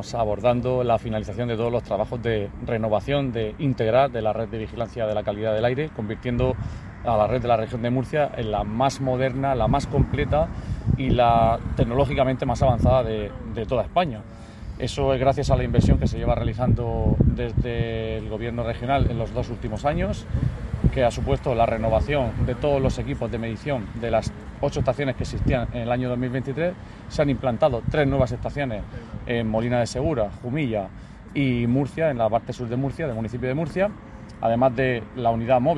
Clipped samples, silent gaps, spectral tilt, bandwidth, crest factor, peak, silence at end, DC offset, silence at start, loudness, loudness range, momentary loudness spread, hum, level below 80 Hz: under 0.1%; none; -7.5 dB/octave; 11.5 kHz; 18 dB; -4 dBFS; 0 s; under 0.1%; 0 s; -24 LUFS; 4 LU; 8 LU; none; -34 dBFS